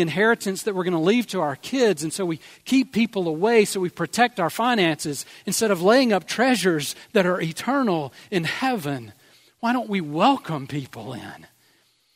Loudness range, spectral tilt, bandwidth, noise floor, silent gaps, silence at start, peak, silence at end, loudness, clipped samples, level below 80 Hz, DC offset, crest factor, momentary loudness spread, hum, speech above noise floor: 4 LU; -4.5 dB/octave; 16 kHz; -62 dBFS; none; 0 s; -2 dBFS; 0.8 s; -22 LUFS; under 0.1%; -68 dBFS; under 0.1%; 20 dB; 11 LU; none; 40 dB